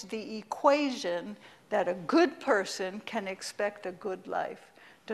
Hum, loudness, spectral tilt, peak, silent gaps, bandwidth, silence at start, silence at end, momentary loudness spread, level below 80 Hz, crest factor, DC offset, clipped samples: none; -31 LUFS; -4 dB/octave; -10 dBFS; none; 13.5 kHz; 0 s; 0 s; 13 LU; -76 dBFS; 22 dB; under 0.1%; under 0.1%